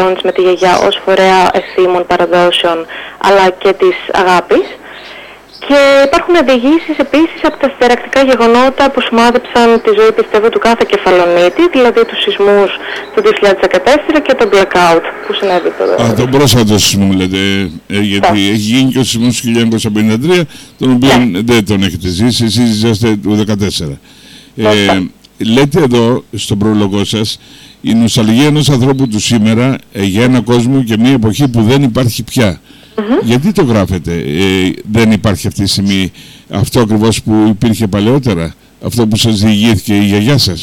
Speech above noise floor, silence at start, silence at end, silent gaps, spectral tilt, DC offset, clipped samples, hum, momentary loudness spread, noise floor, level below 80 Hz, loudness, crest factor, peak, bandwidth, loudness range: 23 dB; 0 s; 0 s; none; -5 dB/octave; under 0.1%; under 0.1%; none; 7 LU; -32 dBFS; -36 dBFS; -10 LUFS; 10 dB; 0 dBFS; 17.5 kHz; 3 LU